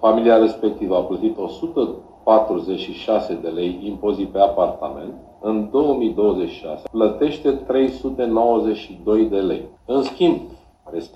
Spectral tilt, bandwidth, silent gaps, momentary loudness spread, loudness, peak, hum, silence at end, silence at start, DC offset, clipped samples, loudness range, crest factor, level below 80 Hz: -7.5 dB/octave; 8.2 kHz; none; 11 LU; -20 LUFS; -2 dBFS; none; 0.1 s; 0 s; under 0.1%; under 0.1%; 2 LU; 18 dB; -48 dBFS